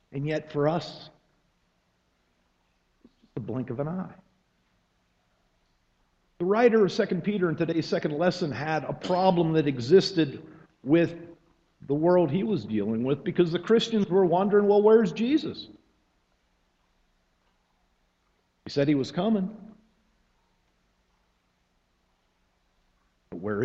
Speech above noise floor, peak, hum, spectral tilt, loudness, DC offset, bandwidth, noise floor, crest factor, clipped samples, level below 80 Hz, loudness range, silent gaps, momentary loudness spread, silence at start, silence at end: 47 dB; -6 dBFS; none; -7 dB/octave; -25 LUFS; under 0.1%; 8 kHz; -71 dBFS; 20 dB; under 0.1%; -64 dBFS; 15 LU; none; 15 LU; 0.1 s; 0 s